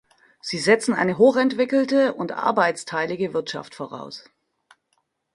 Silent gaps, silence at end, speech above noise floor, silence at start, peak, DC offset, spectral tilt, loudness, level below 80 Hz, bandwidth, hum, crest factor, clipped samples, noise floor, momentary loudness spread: none; 1.15 s; 50 dB; 0.45 s; -4 dBFS; under 0.1%; -4.5 dB/octave; -21 LUFS; -66 dBFS; 11.5 kHz; none; 20 dB; under 0.1%; -72 dBFS; 17 LU